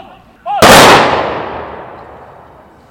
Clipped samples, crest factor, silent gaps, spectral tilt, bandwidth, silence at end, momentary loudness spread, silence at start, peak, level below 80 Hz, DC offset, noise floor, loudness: 3%; 10 dB; none; -3 dB/octave; over 20 kHz; 0.9 s; 25 LU; 0.45 s; 0 dBFS; -34 dBFS; under 0.1%; -39 dBFS; -5 LUFS